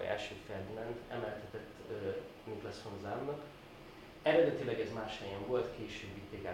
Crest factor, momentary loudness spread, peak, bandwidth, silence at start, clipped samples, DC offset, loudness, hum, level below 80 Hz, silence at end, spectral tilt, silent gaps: 22 dB; 16 LU; -18 dBFS; 16.5 kHz; 0 s; under 0.1%; under 0.1%; -39 LUFS; none; -64 dBFS; 0 s; -6 dB/octave; none